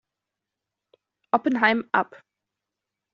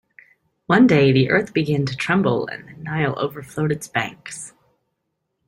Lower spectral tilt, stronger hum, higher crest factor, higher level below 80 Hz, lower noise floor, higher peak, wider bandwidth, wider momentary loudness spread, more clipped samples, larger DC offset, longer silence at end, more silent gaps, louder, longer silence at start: second, -2 dB/octave vs -6.5 dB/octave; neither; first, 24 dB vs 18 dB; second, -72 dBFS vs -56 dBFS; first, -86 dBFS vs -75 dBFS; about the same, -4 dBFS vs -2 dBFS; second, 6.8 kHz vs 15.5 kHz; second, 6 LU vs 19 LU; neither; neither; about the same, 1.1 s vs 1 s; neither; second, -23 LUFS vs -19 LUFS; first, 1.35 s vs 0.7 s